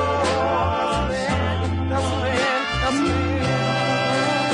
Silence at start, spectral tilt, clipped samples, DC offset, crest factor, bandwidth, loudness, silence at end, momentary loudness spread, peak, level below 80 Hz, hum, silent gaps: 0 s; -5 dB/octave; under 0.1%; under 0.1%; 12 dB; 11 kHz; -21 LUFS; 0 s; 3 LU; -10 dBFS; -38 dBFS; none; none